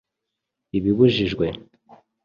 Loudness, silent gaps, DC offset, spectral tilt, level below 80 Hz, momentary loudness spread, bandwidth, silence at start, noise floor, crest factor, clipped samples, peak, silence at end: -21 LUFS; none; under 0.1%; -8 dB/octave; -48 dBFS; 11 LU; 7 kHz; 0.75 s; -82 dBFS; 20 dB; under 0.1%; -4 dBFS; 0.65 s